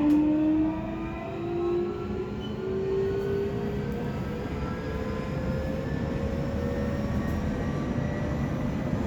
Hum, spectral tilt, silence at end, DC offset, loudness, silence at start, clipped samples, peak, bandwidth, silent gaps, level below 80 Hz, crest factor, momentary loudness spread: none; -8.5 dB/octave; 0 s; under 0.1%; -29 LUFS; 0 s; under 0.1%; -14 dBFS; 18.5 kHz; none; -40 dBFS; 14 dB; 7 LU